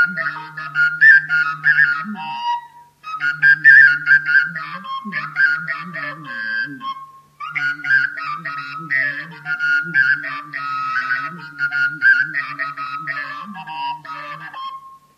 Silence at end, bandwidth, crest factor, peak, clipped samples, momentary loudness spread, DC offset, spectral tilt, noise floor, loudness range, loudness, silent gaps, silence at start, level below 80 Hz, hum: 0.2 s; 9.2 kHz; 18 dB; 0 dBFS; under 0.1%; 19 LU; under 0.1%; -3.5 dB/octave; -39 dBFS; 8 LU; -16 LUFS; none; 0 s; -74 dBFS; none